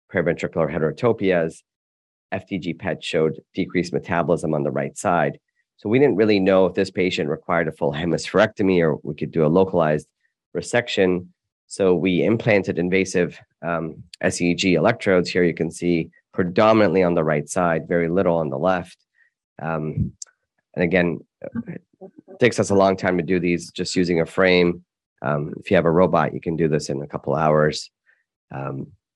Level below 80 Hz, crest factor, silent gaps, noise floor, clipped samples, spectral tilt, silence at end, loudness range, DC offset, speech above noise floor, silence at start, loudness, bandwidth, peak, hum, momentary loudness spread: -56 dBFS; 20 dB; 1.76-2.29 s, 10.46-10.52 s, 11.52-11.68 s, 19.44-19.56 s, 25.06-25.16 s, 28.36-28.48 s; -64 dBFS; under 0.1%; -6 dB/octave; 0.3 s; 5 LU; under 0.1%; 43 dB; 0.1 s; -21 LUFS; 11.5 kHz; -2 dBFS; none; 13 LU